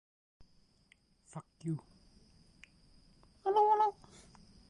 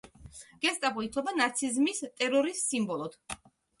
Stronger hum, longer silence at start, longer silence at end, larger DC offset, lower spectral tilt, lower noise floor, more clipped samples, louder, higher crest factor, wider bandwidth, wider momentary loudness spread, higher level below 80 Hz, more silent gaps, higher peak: neither; first, 1.35 s vs 0.05 s; first, 0.8 s vs 0.45 s; neither; first, -7 dB/octave vs -2.5 dB/octave; first, -69 dBFS vs -51 dBFS; neither; second, -33 LUFS vs -30 LUFS; about the same, 20 dB vs 20 dB; about the same, 11 kHz vs 11.5 kHz; first, 23 LU vs 16 LU; second, -70 dBFS vs -64 dBFS; neither; second, -18 dBFS vs -12 dBFS